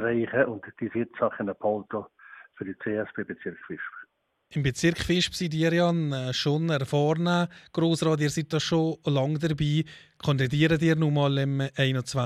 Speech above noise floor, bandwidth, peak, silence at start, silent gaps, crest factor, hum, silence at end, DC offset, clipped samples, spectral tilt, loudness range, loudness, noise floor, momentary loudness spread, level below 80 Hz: 31 dB; 13 kHz; -8 dBFS; 0 s; none; 18 dB; none; 0 s; under 0.1%; under 0.1%; -6 dB/octave; 7 LU; -26 LUFS; -57 dBFS; 13 LU; -56 dBFS